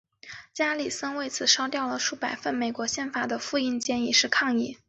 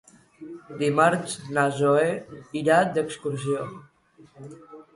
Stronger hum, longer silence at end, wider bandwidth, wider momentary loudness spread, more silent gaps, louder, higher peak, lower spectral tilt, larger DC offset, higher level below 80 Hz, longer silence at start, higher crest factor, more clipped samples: neither; about the same, 0.15 s vs 0.15 s; second, 8.4 kHz vs 11.5 kHz; second, 9 LU vs 22 LU; neither; about the same, -26 LUFS vs -24 LUFS; about the same, -6 dBFS vs -6 dBFS; second, -1 dB/octave vs -5.5 dB/octave; neither; about the same, -68 dBFS vs -66 dBFS; second, 0.25 s vs 0.4 s; about the same, 22 dB vs 20 dB; neither